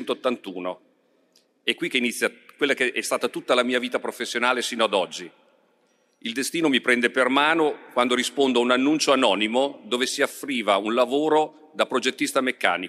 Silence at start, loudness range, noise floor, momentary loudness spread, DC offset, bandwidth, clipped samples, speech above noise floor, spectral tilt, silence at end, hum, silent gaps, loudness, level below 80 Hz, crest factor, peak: 0 s; 5 LU; -65 dBFS; 10 LU; under 0.1%; 15.5 kHz; under 0.1%; 42 dB; -2.5 dB/octave; 0 s; none; none; -23 LUFS; -76 dBFS; 22 dB; -2 dBFS